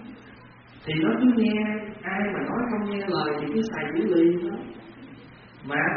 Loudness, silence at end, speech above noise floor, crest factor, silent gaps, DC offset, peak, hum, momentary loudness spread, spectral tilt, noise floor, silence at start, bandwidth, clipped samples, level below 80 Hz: -25 LUFS; 0 s; 24 dB; 16 dB; none; under 0.1%; -10 dBFS; none; 23 LU; -5 dB/octave; -48 dBFS; 0 s; 5.2 kHz; under 0.1%; -60 dBFS